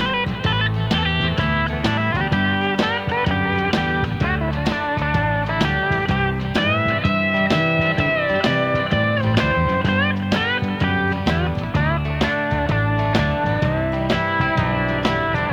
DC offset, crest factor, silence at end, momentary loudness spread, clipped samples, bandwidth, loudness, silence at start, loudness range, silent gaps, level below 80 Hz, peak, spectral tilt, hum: under 0.1%; 18 dB; 0 s; 3 LU; under 0.1%; 10.5 kHz; -20 LUFS; 0 s; 2 LU; none; -34 dBFS; -2 dBFS; -6.5 dB/octave; none